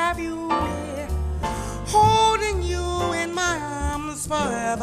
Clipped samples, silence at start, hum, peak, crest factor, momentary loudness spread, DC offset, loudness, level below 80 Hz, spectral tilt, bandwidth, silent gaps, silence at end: under 0.1%; 0 s; none; -6 dBFS; 18 dB; 11 LU; under 0.1%; -23 LUFS; -32 dBFS; -4 dB/octave; 14 kHz; none; 0 s